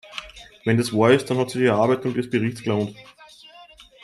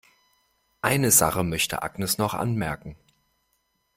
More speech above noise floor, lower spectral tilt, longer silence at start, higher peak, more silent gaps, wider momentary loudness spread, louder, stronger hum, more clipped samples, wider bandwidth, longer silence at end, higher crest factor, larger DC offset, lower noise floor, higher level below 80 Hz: second, 27 dB vs 48 dB; first, -6 dB/octave vs -3.5 dB/octave; second, 0.05 s vs 0.85 s; about the same, -4 dBFS vs -4 dBFS; neither; about the same, 14 LU vs 13 LU; about the same, -21 LUFS vs -23 LUFS; neither; neither; second, 13 kHz vs 16.5 kHz; second, 0.2 s vs 1.05 s; about the same, 20 dB vs 22 dB; neither; second, -48 dBFS vs -72 dBFS; second, -58 dBFS vs -52 dBFS